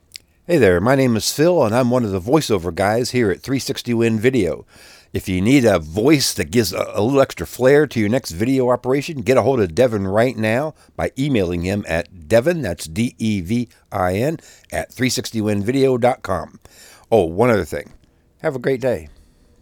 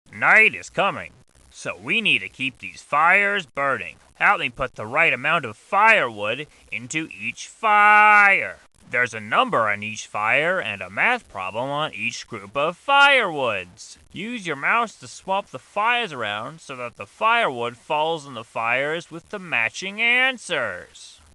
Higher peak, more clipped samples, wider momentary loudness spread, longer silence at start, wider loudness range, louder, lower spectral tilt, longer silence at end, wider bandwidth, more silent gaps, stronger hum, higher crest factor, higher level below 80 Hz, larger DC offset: about the same, -2 dBFS vs -2 dBFS; neither; second, 10 LU vs 18 LU; first, 0.5 s vs 0.1 s; second, 4 LU vs 7 LU; about the same, -18 LUFS vs -20 LUFS; first, -5.5 dB/octave vs -3 dB/octave; first, 0.55 s vs 0.25 s; first, 19.5 kHz vs 12 kHz; neither; neither; about the same, 16 dB vs 20 dB; first, -46 dBFS vs -60 dBFS; neither